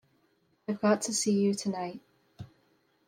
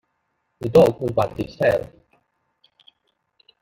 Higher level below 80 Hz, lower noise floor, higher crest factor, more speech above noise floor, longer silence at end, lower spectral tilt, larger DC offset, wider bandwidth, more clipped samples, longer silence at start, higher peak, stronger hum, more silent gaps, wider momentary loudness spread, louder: second, -74 dBFS vs -52 dBFS; about the same, -71 dBFS vs -73 dBFS; about the same, 20 dB vs 20 dB; second, 42 dB vs 54 dB; second, 0.6 s vs 1.8 s; second, -4.5 dB/octave vs -7 dB/octave; neither; about the same, 15.5 kHz vs 16.5 kHz; neither; about the same, 0.7 s vs 0.6 s; second, -12 dBFS vs -2 dBFS; neither; neither; first, 23 LU vs 13 LU; second, -29 LUFS vs -20 LUFS